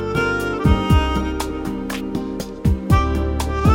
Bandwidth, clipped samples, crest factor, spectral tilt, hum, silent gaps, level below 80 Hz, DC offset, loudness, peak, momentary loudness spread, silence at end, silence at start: 17 kHz; under 0.1%; 16 dB; -6.5 dB/octave; none; none; -24 dBFS; under 0.1%; -20 LUFS; -4 dBFS; 9 LU; 0 s; 0 s